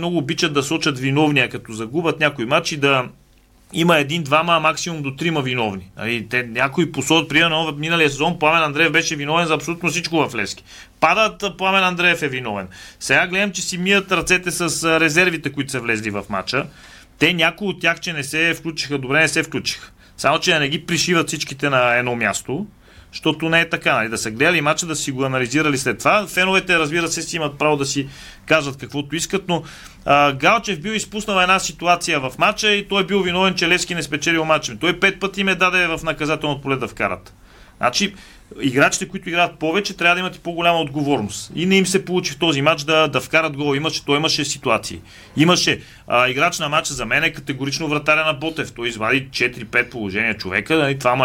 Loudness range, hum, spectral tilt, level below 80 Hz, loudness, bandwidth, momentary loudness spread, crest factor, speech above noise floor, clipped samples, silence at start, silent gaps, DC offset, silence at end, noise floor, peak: 2 LU; none; -3.5 dB/octave; -48 dBFS; -18 LUFS; 17 kHz; 9 LU; 16 dB; 33 dB; under 0.1%; 0 s; none; under 0.1%; 0 s; -52 dBFS; -2 dBFS